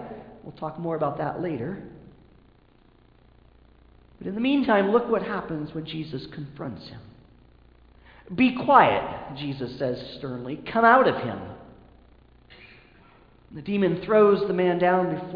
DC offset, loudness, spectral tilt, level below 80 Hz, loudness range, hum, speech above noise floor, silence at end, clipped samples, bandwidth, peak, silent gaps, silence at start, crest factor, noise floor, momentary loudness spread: under 0.1%; -24 LUFS; -9 dB/octave; -56 dBFS; 11 LU; 60 Hz at -55 dBFS; 33 dB; 0 s; under 0.1%; 5.2 kHz; -2 dBFS; none; 0 s; 24 dB; -57 dBFS; 21 LU